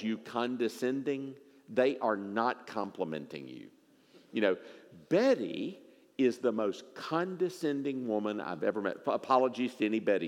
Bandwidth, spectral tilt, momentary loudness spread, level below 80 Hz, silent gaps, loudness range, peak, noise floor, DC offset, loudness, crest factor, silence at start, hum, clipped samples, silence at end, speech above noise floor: 16 kHz; -6 dB/octave; 12 LU; -90 dBFS; none; 3 LU; -12 dBFS; -62 dBFS; under 0.1%; -33 LUFS; 20 dB; 0 s; none; under 0.1%; 0 s; 30 dB